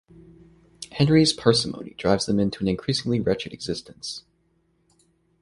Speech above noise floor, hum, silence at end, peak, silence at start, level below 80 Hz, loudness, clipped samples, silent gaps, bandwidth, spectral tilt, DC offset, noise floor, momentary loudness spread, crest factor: 44 dB; none; 1.2 s; -2 dBFS; 0.8 s; -52 dBFS; -23 LUFS; under 0.1%; none; 11.5 kHz; -5.5 dB/octave; under 0.1%; -67 dBFS; 16 LU; 22 dB